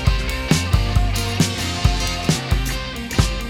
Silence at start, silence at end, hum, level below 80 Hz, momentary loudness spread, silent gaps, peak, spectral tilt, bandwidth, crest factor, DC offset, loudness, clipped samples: 0 s; 0 s; none; -24 dBFS; 4 LU; none; -2 dBFS; -4.5 dB/octave; 18 kHz; 18 dB; under 0.1%; -20 LUFS; under 0.1%